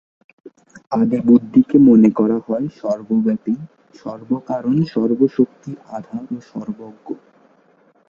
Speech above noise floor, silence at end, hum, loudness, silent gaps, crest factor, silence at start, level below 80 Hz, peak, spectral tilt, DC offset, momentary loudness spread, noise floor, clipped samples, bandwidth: 38 dB; 0.95 s; none; -17 LUFS; none; 16 dB; 0.75 s; -58 dBFS; -2 dBFS; -9.5 dB/octave; under 0.1%; 21 LU; -55 dBFS; under 0.1%; 7 kHz